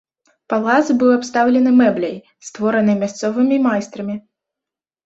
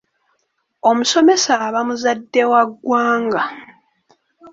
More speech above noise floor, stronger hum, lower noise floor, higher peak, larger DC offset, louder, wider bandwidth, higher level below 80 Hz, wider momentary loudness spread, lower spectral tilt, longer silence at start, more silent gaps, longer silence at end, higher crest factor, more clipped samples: first, 71 dB vs 53 dB; neither; first, -87 dBFS vs -68 dBFS; about the same, -2 dBFS vs -2 dBFS; neither; about the same, -16 LUFS vs -16 LUFS; about the same, 7.8 kHz vs 8 kHz; about the same, -62 dBFS vs -66 dBFS; first, 14 LU vs 7 LU; first, -6 dB/octave vs -2.5 dB/octave; second, 0.5 s vs 0.85 s; neither; first, 0.85 s vs 0.05 s; about the same, 16 dB vs 16 dB; neither